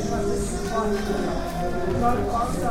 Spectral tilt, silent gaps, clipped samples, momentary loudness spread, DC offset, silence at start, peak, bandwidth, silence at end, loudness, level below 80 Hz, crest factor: -6 dB/octave; none; under 0.1%; 4 LU; under 0.1%; 0 s; -10 dBFS; 16.5 kHz; 0 s; -25 LUFS; -34 dBFS; 14 dB